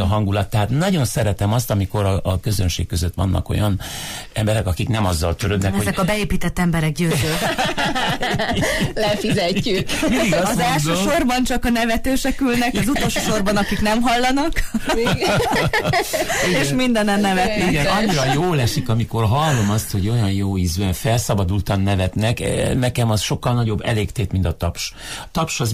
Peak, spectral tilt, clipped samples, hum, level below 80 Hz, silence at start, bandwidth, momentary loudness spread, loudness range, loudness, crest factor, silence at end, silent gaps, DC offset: -6 dBFS; -5 dB/octave; under 0.1%; none; -32 dBFS; 0 s; 15.5 kHz; 4 LU; 3 LU; -19 LUFS; 12 dB; 0 s; none; under 0.1%